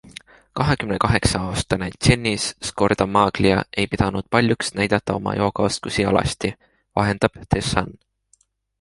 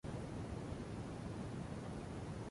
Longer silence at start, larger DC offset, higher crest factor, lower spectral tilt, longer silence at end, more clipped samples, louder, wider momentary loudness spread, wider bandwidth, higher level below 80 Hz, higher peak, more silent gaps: first, 0.55 s vs 0.05 s; neither; first, 20 dB vs 12 dB; second, -5 dB/octave vs -7 dB/octave; first, 0.9 s vs 0 s; neither; first, -21 LUFS vs -47 LUFS; first, 7 LU vs 1 LU; about the same, 11.5 kHz vs 11.5 kHz; first, -38 dBFS vs -56 dBFS; first, -2 dBFS vs -34 dBFS; neither